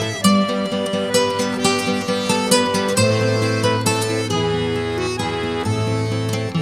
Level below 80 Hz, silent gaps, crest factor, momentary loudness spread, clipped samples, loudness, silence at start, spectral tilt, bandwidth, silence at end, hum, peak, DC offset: -46 dBFS; none; 18 dB; 6 LU; under 0.1%; -19 LUFS; 0 s; -4.5 dB/octave; 16 kHz; 0 s; none; -2 dBFS; 0.1%